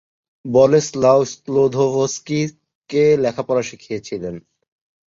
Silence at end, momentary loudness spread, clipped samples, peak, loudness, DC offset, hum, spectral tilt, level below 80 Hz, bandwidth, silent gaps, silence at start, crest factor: 0.65 s; 13 LU; under 0.1%; -2 dBFS; -18 LUFS; under 0.1%; none; -5.5 dB/octave; -56 dBFS; 7.8 kHz; 2.75-2.82 s; 0.45 s; 16 dB